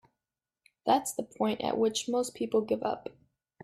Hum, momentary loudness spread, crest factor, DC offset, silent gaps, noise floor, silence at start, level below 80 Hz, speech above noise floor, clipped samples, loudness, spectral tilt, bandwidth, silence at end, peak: none; 8 LU; 20 dB; under 0.1%; none; under -90 dBFS; 0.85 s; -72 dBFS; over 60 dB; under 0.1%; -31 LUFS; -4 dB/octave; 15.5 kHz; 0.55 s; -12 dBFS